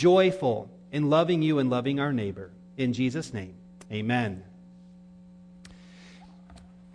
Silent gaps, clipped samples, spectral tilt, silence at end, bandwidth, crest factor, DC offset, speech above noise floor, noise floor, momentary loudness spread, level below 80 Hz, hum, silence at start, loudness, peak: none; under 0.1%; -7 dB/octave; 0.35 s; 10 kHz; 18 dB; under 0.1%; 25 dB; -50 dBFS; 16 LU; -62 dBFS; none; 0 s; -27 LUFS; -10 dBFS